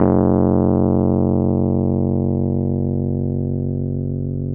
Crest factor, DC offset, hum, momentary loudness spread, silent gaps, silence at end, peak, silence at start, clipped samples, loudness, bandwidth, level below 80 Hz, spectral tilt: 18 dB; under 0.1%; none; 7 LU; none; 0 s; 0 dBFS; 0 s; under 0.1%; -18 LUFS; 2.1 kHz; -40 dBFS; -16 dB/octave